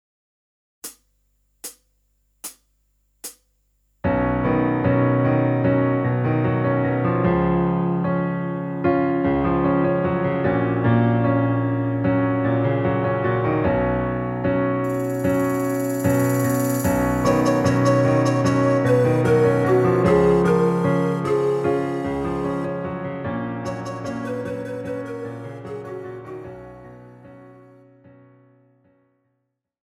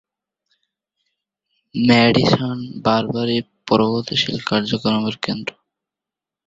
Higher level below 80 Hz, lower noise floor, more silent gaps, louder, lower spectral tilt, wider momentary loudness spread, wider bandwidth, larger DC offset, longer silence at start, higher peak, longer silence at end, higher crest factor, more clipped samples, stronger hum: first, -44 dBFS vs -54 dBFS; second, -75 dBFS vs -87 dBFS; neither; second, -21 LUFS vs -18 LUFS; first, -7.5 dB/octave vs -6 dB/octave; first, 16 LU vs 11 LU; first, 16.5 kHz vs 7.8 kHz; neither; second, 0.85 s vs 1.75 s; about the same, -4 dBFS vs -2 dBFS; first, 2.4 s vs 0.95 s; about the same, 16 dB vs 18 dB; neither; neither